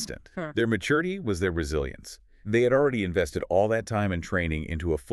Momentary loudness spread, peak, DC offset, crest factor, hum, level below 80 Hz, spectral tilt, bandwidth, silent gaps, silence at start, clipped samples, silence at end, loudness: 12 LU; -10 dBFS; under 0.1%; 16 dB; none; -42 dBFS; -6 dB/octave; 13 kHz; none; 0 s; under 0.1%; 0 s; -27 LUFS